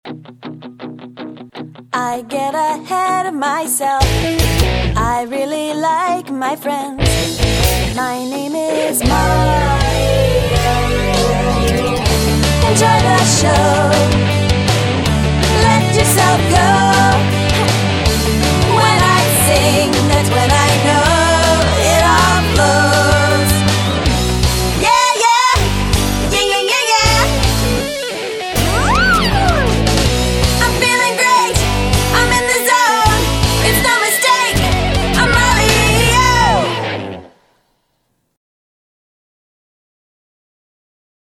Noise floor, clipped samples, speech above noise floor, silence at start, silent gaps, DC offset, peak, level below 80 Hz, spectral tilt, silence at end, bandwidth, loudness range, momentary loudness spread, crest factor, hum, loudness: -65 dBFS; under 0.1%; 51 dB; 0.05 s; none; under 0.1%; 0 dBFS; -22 dBFS; -4 dB/octave; 4.05 s; 18.5 kHz; 5 LU; 9 LU; 14 dB; none; -13 LUFS